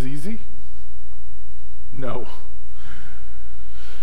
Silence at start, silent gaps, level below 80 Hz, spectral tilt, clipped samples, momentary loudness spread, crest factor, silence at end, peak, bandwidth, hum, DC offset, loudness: 0 s; none; -42 dBFS; -7 dB/octave; under 0.1%; 14 LU; 18 dB; 0 s; -6 dBFS; 16 kHz; none; 40%; -38 LUFS